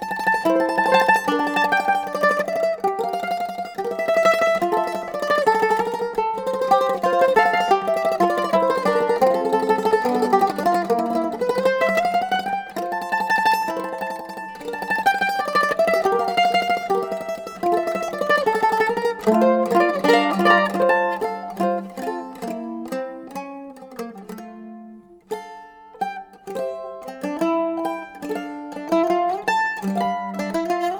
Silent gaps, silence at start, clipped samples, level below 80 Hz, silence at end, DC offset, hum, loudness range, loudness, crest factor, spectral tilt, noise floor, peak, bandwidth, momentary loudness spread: none; 0 s; under 0.1%; -60 dBFS; 0 s; under 0.1%; none; 12 LU; -20 LUFS; 18 dB; -4.5 dB/octave; -43 dBFS; -2 dBFS; over 20 kHz; 15 LU